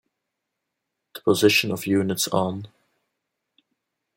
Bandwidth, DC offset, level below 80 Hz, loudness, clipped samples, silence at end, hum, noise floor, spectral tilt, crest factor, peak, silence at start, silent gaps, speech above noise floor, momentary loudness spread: 16.5 kHz; under 0.1%; -66 dBFS; -22 LUFS; under 0.1%; 1.5 s; none; -82 dBFS; -4 dB/octave; 22 dB; -4 dBFS; 1.15 s; none; 60 dB; 14 LU